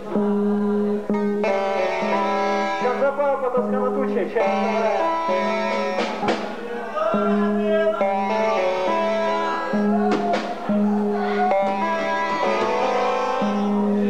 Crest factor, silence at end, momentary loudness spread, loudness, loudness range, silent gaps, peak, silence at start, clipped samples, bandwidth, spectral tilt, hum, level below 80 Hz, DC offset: 12 dB; 0 s; 3 LU; -21 LUFS; 1 LU; none; -8 dBFS; 0 s; under 0.1%; 9 kHz; -6.5 dB/octave; none; -60 dBFS; 1%